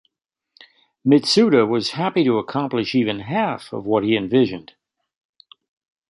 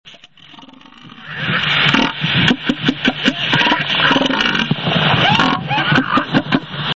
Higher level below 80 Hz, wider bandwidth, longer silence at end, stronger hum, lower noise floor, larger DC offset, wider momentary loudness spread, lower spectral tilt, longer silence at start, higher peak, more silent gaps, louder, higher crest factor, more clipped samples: second, -60 dBFS vs -44 dBFS; first, 11.5 kHz vs 8 kHz; first, 1.5 s vs 0.05 s; neither; first, -80 dBFS vs -42 dBFS; second, under 0.1% vs 0.2%; first, 9 LU vs 5 LU; about the same, -5.5 dB/octave vs -5 dB/octave; first, 1.05 s vs 0.05 s; about the same, -2 dBFS vs 0 dBFS; neither; second, -19 LUFS vs -14 LUFS; about the same, 18 dB vs 16 dB; neither